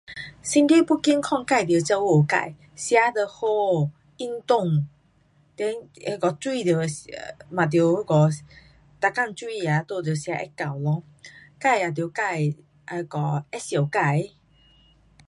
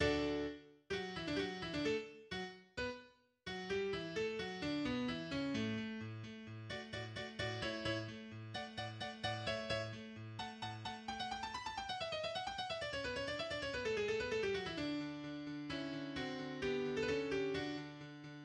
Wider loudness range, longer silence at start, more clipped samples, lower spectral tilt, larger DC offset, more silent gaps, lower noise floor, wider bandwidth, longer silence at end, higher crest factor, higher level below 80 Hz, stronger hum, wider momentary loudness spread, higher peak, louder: first, 6 LU vs 3 LU; about the same, 0.1 s vs 0 s; neither; about the same, -6 dB/octave vs -5 dB/octave; neither; neither; about the same, -61 dBFS vs -62 dBFS; about the same, 11.5 kHz vs 11 kHz; first, 1.05 s vs 0 s; about the same, 20 dB vs 20 dB; about the same, -64 dBFS vs -64 dBFS; neither; first, 13 LU vs 9 LU; first, -4 dBFS vs -22 dBFS; first, -23 LUFS vs -42 LUFS